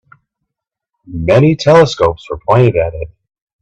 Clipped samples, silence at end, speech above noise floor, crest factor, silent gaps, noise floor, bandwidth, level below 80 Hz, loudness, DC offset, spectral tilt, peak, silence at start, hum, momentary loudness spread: under 0.1%; 0.55 s; 68 dB; 14 dB; none; -79 dBFS; 9 kHz; -38 dBFS; -11 LUFS; under 0.1%; -7 dB/octave; 0 dBFS; 1.1 s; none; 18 LU